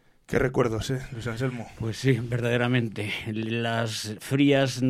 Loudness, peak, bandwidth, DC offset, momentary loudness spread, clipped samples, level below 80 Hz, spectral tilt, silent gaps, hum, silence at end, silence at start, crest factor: -27 LUFS; -8 dBFS; 15 kHz; under 0.1%; 9 LU; under 0.1%; -50 dBFS; -6 dB/octave; none; none; 0 s; 0.3 s; 18 dB